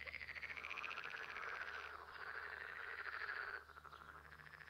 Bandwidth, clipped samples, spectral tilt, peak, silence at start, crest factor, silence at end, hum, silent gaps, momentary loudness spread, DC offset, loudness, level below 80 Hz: 16 kHz; under 0.1%; -2.5 dB/octave; -32 dBFS; 0 s; 18 dB; 0 s; none; none; 12 LU; under 0.1%; -49 LUFS; -74 dBFS